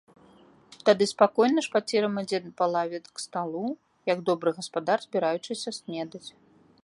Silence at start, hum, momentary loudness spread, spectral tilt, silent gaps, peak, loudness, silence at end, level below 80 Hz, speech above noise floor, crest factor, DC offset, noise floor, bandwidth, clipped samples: 0.85 s; none; 13 LU; -4.5 dB/octave; none; -6 dBFS; -27 LUFS; 0.55 s; -76 dBFS; 30 dB; 22 dB; under 0.1%; -56 dBFS; 11.5 kHz; under 0.1%